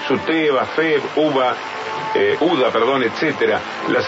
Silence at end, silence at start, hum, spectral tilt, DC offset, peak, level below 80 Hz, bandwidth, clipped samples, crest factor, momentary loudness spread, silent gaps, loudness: 0 s; 0 s; none; -5 dB/octave; under 0.1%; -4 dBFS; -62 dBFS; 7.8 kHz; under 0.1%; 14 dB; 5 LU; none; -18 LUFS